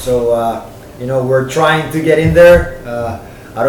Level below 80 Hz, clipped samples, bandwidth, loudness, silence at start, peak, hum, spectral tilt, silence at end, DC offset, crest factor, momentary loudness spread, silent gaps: -30 dBFS; 0.3%; 18.5 kHz; -12 LUFS; 0 s; 0 dBFS; none; -6 dB/octave; 0 s; under 0.1%; 12 dB; 19 LU; none